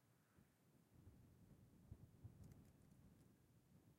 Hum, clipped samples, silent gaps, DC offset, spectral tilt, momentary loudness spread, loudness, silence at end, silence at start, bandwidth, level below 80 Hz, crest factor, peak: none; under 0.1%; none; under 0.1%; -7 dB/octave; 5 LU; -66 LUFS; 0 s; 0 s; 16 kHz; -78 dBFS; 22 dB; -46 dBFS